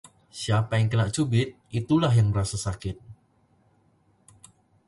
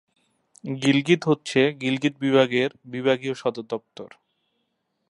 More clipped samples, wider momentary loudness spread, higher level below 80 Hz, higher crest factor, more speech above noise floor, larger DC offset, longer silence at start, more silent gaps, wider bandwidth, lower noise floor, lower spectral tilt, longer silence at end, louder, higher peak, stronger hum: neither; about the same, 13 LU vs 14 LU; first, -48 dBFS vs -70 dBFS; about the same, 18 dB vs 22 dB; second, 40 dB vs 52 dB; neither; second, 0.35 s vs 0.65 s; neither; about the same, 11.5 kHz vs 11 kHz; second, -64 dBFS vs -75 dBFS; about the same, -6 dB/octave vs -5.5 dB/octave; first, 1.75 s vs 1.05 s; about the same, -25 LUFS vs -23 LUFS; second, -10 dBFS vs -4 dBFS; neither